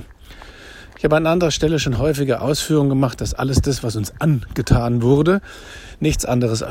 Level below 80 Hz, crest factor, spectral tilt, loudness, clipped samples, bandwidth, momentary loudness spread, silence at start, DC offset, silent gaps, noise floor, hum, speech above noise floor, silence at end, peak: -32 dBFS; 18 dB; -6 dB/octave; -18 LUFS; under 0.1%; 16.5 kHz; 20 LU; 0 s; under 0.1%; none; -40 dBFS; none; 22 dB; 0 s; 0 dBFS